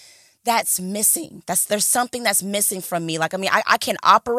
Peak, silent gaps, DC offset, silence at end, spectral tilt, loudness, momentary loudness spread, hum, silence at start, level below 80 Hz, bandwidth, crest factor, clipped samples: 0 dBFS; none; under 0.1%; 0 s; -1.5 dB/octave; -19 LUFS; 6 LU; none; 0.45 s; -64 dBFS; 16.5 kHz; 20 dB; under 0.1%